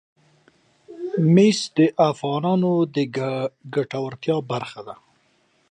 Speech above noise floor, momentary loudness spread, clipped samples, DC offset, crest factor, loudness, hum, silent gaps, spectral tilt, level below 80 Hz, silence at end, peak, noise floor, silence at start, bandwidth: 43 dB; 13 LU; under 0.1%; under 0.1%; 18 dB; -21 LUFS; none; none; -6.5 dB/octave; -68 dBFS; 0.8 s; -4 dBFS; -63 dBFS; 0.9 s; 9.4 kHz